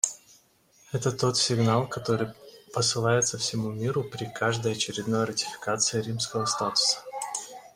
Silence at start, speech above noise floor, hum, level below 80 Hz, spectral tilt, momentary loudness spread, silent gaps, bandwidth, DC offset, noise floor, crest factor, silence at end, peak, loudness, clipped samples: 0.05 s; 34 dB; none; -62 dBFS; -3.5 dB/octave; 10 LU; none; 16 kHz; under 0.1%; -61 dBFS; 26 dB; 0.1 s; -2 dBFS; -27 LUFS; under 0.1%